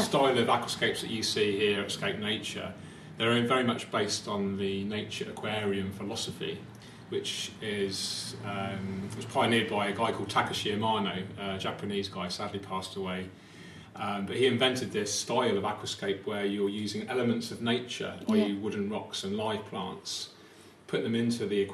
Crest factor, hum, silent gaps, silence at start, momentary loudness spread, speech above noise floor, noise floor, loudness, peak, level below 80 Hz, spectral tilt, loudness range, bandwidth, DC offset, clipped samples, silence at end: 20 dB; none; none; 0 s; 10 LU; 23 dB; -54 dBFS; -31 LUFS; -12 dBFS; -70 dBFS; -4 dB/octave; 5 LU; 13.5 kHz; under 0.1%; under 0.1%; 0 s